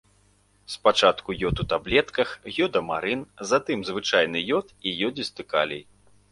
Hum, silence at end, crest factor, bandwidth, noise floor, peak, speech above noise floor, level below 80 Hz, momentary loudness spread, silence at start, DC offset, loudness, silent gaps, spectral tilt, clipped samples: 50 Hz at -55 dBFS; 0.5 s; 22 dB; 11.5 kHz; -62 dBFS; -2 dBFS; 37 dB; -48 dBFS; 8 LU; 0.7 s; under 0.1%; -25 LUFS; none; -4 dB/octave; under 0.1%